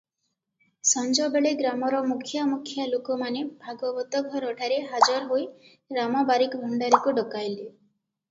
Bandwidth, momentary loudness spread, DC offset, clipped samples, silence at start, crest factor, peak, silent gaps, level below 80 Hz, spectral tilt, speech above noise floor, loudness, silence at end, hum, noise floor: 8 kHz; 11 LU; under 0.1%; under 0.1%; 0.85 s; 24 dB; -4 dBFS; none; -76 dBFS; -2 dB/octave; 54 dB; -25 LUFS; 0.6 s; none; -79 dBFS